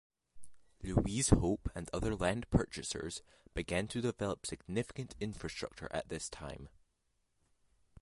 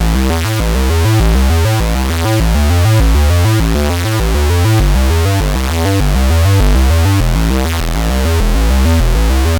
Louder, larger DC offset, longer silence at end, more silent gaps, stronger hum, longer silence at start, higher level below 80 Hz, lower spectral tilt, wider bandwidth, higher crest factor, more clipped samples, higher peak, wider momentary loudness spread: second, -37 LUFS vs -12 LUFS; neither; first, 1.35 s vs 0 s; neither; neither; first, 0.35 s vs 0 s; second, -48 dBFS vs -14 dBFS; about the same, -5 dB/octave vs -5.5 dB/octave; second, 11.5 kHz vs 19.5 kHz; first, 26 dB vs 10 dB; neither; second, -12 dBFS vs 0 dBFS; first, 14 LU vs 4 LU